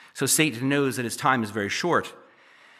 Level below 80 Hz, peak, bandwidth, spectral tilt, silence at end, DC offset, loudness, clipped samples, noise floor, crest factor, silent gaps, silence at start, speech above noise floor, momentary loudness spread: -72 dBFS; -6 dBFS; 15 kHz; -3.5 dB/octave; 0.6 s; under 0.1%; -24 LUFS; under 0.1%; -54 dBFS; 20 dB; none; 0.15 s; 30 dB; 6 LU